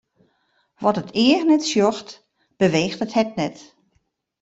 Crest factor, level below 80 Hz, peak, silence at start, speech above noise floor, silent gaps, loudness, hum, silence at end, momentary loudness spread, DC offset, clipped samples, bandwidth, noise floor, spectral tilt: 18 dB; -62 dBFS; -4 dBFS; 0.8 s; 49 dB; none; -20 LUFS; none; 0.8 s; 11 LU; under 0.1%; under 0.1%; 8 kHz; -69 dBFS; -5 dB/octave